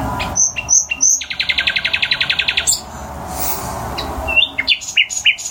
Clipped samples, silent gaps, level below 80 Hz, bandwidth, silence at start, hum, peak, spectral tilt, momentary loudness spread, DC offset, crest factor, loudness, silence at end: under 0.1%; none; -36 dBFS; 17 kHz; 0 s; none; 0 dBFS; 0 dB/octave; 11 LU; under 0.1%; 18 dB; -15 LUFS; 0 s